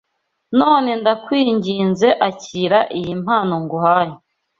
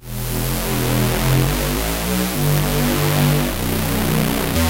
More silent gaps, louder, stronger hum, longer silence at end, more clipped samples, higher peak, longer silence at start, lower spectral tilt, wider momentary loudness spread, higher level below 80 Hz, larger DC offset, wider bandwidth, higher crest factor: neither; about the same, -17 LUFS vs -19 LUFS; neither; first, 0.45 s vs 0 s; neither; about the same, -2 dBFS vs -2 dBFS; first, 0.5 s vs 0 s; about the same, -6 dB/octave vs -5 dB/octave; first, 7 LU vs 4 LU; second, -58 dBFS vs -28 dBFS; neither; second, 7.6 kHz vs 17.5 kHz; about the same, 16 dB vs 16 dB